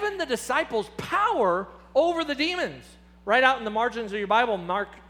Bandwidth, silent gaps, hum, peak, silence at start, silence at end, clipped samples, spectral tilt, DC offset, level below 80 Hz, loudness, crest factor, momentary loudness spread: over 20 kHz; none; none; -4 dBFS; 0 s; 0.1 s; under 0.1%; -3.5 dB/octave; under 0.1%; -56 dBFS; -25 LUFS; 22 dB; 9 LU